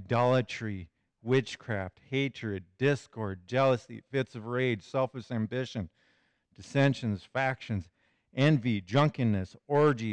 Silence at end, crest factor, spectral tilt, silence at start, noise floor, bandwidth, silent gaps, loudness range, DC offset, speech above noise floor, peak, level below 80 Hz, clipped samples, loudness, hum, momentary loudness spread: 0 s; 14 dB; -7 dB/octave; 0 s; -70 dBFS; 9.4 kHz; none; 4 LU; under 0.1%; 41 dB; -16 dBFS; -66 dBFS; under 0.1%; -30 LUFS; none; 12 LU